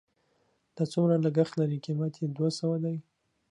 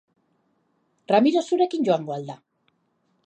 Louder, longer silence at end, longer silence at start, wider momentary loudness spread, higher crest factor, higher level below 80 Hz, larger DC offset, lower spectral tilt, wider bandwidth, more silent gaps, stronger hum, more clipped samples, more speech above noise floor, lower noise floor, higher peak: second, -29 LUFS vs -22 LUFS; second, 0.5 s vs 0.9 s; second, 0.75 s vs 1.1 s; second, 8 LU vs 17 LU; about the same, 18 dB vs 20 dB; first, -76 dBFS vs -82 dBFS; neither; first, -8 dB/octave vs -6 dB/octave; first, 11 kHz vs 9 kHz; neither; neither; neither; second, 44 dB vs 48 dB; about the same, -72 dBFS vs -70 dBFS; second, -12 dBFS vs -6 dBFS